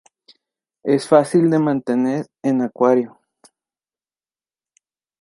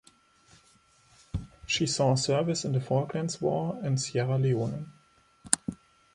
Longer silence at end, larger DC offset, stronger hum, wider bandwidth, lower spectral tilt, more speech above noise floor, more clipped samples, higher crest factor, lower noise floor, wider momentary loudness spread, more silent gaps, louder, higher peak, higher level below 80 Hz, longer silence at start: first, 2.15 s vs 0.4 s; neither; neither; second, 11.5 kHz vs 13 kHz; first, -7 dB/octave vs -4.5 dB/octave; first, over 73 dB vs 35 dB; neither; second, 18 dB vs 30 dB; first, under -90 dBFS vs -63 dBFS; second, 8 LU vs 14 LU; neither; first, -18 LUFS vs -29 LUFS; about the same, -2 dBFS vs 0 dBFS; second, -70 dBFS vs -54 dBFS; second, 0.85 s vs 1.35 s